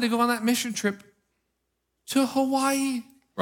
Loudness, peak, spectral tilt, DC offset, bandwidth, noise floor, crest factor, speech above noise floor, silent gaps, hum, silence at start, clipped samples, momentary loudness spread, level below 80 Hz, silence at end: -25 LUFS; -10 dBFS; -3.5 dB/octave; under 0.1%; 17.5 kHz; -78 dBFS; 18 dB; 53 dB; none; none; 0 s; under 0.1%; 10 LU; -76 dBFS; 0 s